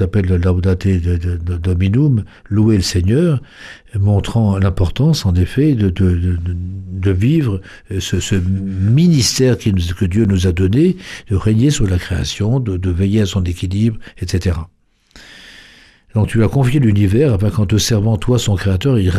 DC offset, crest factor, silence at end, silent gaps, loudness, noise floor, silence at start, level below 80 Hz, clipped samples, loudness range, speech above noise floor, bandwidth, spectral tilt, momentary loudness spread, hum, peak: under 0.1%; 12 dB; 0 s; none; -15 LUFS; -45 dBFS; 0 s; -30 dBFS; under 0.1%; 4 LU; 31 dB; 13.5 kHz; -6.5 dB/octave; 8 LU; none; -2 dBFS